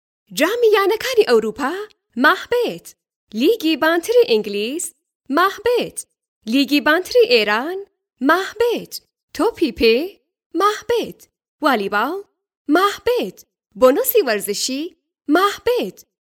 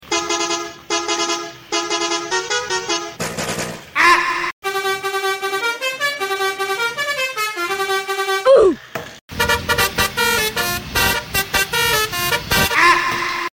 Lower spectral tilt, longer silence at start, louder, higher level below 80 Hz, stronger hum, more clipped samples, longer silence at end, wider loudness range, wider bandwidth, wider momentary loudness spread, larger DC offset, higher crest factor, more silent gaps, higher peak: about the same, -3 dB/octave vs -2 dB/octave; first, 0.3 s vs 0 s; about the same, -18 LUFS vs -18 LUFS; second, -54 dBFS vs -42 dBFS; neither; neither; first, 0.3 s vs 0.1 s; about the same, 2 LU vs 4 LU; first, 19.5 kHz vs 17 kHz; first, 15 LU vs 10 LU; neither; about the same, 18 dB vs 16 dB; first, 3.16-3.27 s, 5.15-5.20 s, 6.28-6.41 s, 9.23-9.28 s, 10.46-10.50 s, 11.48-11.59 s, 12.57-12.65 s vs 4.53-4.62 s, 9.21-9.28 s; about the same, 0 dBFS vs -2 dBFS